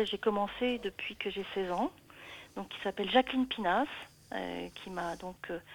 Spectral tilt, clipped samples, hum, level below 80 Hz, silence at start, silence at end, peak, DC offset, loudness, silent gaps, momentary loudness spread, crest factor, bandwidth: -5 dB/octave; under 0.1%; none; -62 dBFS; 0 s; 0 s; -12 dBFS; under 0.1%; -34 LUFS; none; 15 LU; 22 dB; 19.5 kHz